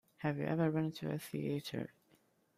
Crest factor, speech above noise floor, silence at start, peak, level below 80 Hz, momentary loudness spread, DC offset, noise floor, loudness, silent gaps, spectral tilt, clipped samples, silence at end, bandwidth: 18 dB; 35 dB; 0.2 s; -20 dBFS; -74 dBFS; 10 LU; under 0.1%; -72 dBFS; -38 LUFS; none; -7 dB/octave; under 0.1%; 0.7 s; 15.5 kHz